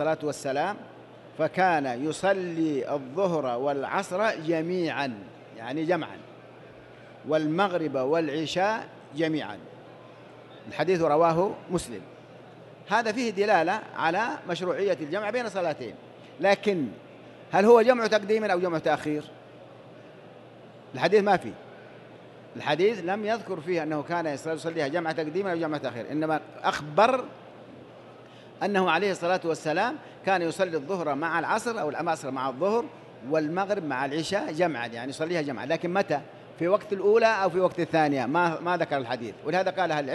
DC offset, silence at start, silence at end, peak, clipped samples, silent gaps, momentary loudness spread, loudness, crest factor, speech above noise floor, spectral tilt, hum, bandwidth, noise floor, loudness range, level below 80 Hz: under 0.1%; 0 s; 0 s; -6 dBFS; under 0.1%; none; 17 LU; -27 LUFS; 22 dB; 22 dB; -5.5 dB/octave; none; 12.5 kHz; -48 dBFS; 5 LU; -68 dBFS